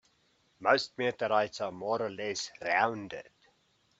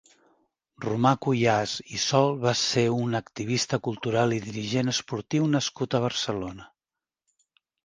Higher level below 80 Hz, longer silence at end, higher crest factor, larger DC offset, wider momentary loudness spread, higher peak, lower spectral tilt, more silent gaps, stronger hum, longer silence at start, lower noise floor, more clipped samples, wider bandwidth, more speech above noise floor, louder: second, -76 dBFS vs -62 dBFS; second, 0.7 s vs 1.2 s; about the same, 24 dB vs 22 dB; neither; about the same, 10 LU vs 8 LU; second, -10 dBFS vs -6 dBFS; about the same, -3.5 dB/octave vs -4.5 dB/octave; neither; neither; second, 0.6 s vs 0.8 s; second, -71 dBFS vs under -90 dBFS; neither; second, 8.4 kHz vs 10 kHz; second, 39 dB vs over 64 dB; second, -31 LUFS vs -26 LUFS